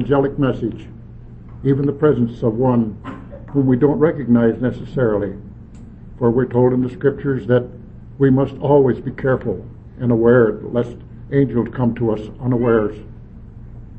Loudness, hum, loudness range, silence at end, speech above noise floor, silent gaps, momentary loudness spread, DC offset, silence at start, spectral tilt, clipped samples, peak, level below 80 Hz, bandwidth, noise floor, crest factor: -18 LUFS; none; 3 LU; 0 s; 20 dB; none; 20 LU; under 0.1%; 0 s; -10.5 dB/octave; under 0.1%; -2 dBFS; -40 dBFS; 4.6 kHz; -37 dBFS; 16 dB